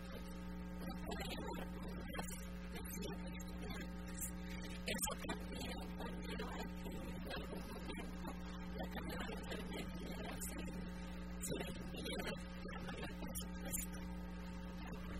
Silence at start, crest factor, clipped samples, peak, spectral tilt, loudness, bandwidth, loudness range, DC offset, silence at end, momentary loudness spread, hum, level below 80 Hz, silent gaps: 0 s; 20 dB; under 0.1%; -26 dBFS; -4.5 dB/octave; -47 LUFS; 16 kHz; 2 LU; 0.1%; 0 s; 5 LU; none; -52 dBFS; none